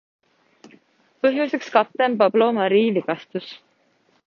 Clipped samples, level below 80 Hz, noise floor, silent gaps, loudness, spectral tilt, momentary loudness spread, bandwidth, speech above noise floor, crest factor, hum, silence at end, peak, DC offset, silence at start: under 0.1%; -74 dBFS; -63 dBFS; none; -20 LUFS; -6.5 dB/octave; 13 LU; 7 kHz; 43 dB; 20 dB; none; 0.7 s; -2 dBFS; under 0.1%; 1.25 s